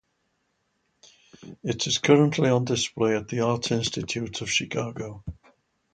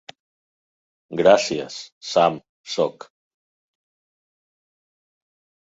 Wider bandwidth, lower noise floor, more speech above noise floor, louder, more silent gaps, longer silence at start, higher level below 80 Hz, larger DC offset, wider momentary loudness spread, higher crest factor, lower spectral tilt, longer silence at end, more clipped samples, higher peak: first, 9.4 kHz vs 8 kHz; second, -73 dBFS vs under -90 dBFS; second, 49 dB vs over 70 dB; second, -25 LUFS vs -20 LUFS; second, none vs 1.92-2.01 s, 2.49-2.64 s; first, 1.4 s vs 1.1 s; first, -54 dBFS vs -64 dBFS; neither; about the same, 16 LU vs 18 LU; about the same, 24 dB vs 22 dB; about the same, -4.5 dB/octave vs -4 dB/octave; second, 0.6 s vs 2.7 s; neither; about the same, -4 dBFS vs -2 dBFS